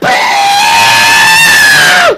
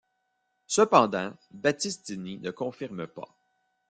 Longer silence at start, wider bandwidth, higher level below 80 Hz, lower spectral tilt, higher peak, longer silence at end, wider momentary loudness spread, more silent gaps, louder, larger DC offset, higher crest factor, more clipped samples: second, 0 s vs 0.7 s; first, 16.5 kHz vs 9.6 kHz; first, -42 dBFS vs -72 dBFS; second, -0.5 dB/octave vs -4 dB/octave; first, 0 dBFS vs -4 dBFS; second, 0 s vs 0.65 s; second, 5 LU vs 18 LU; neither; first, -3 LUFS vs -27 LUFS; neither; second, 6 dB vs 26 dB; first, 0.6% vs under 0.1%